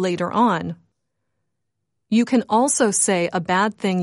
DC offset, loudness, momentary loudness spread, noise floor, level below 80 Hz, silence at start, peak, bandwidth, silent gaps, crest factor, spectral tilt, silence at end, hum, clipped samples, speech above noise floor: under 0.1%; -19 LUFS; 7 LU; -78 dBFS; -66 dBFS; 0 s; -6 dBFS; 11.5 kHz; none; 16 dB; -4 dB/octave; 0 s; none; under 0.1%; 59 dB